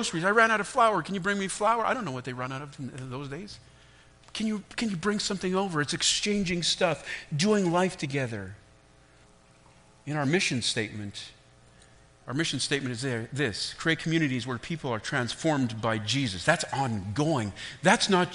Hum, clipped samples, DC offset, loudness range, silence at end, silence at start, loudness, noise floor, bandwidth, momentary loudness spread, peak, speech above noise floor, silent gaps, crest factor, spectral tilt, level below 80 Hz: none; under 0.1%; under 0.1%; 5 LU; 0 s; 0 s; -28 LUFS; -57 dBFS; 10.5 kHz; 14 LU; -6 dBFS; 29 dB; none; 22 dB; -4 dB/octave; -58 dBFS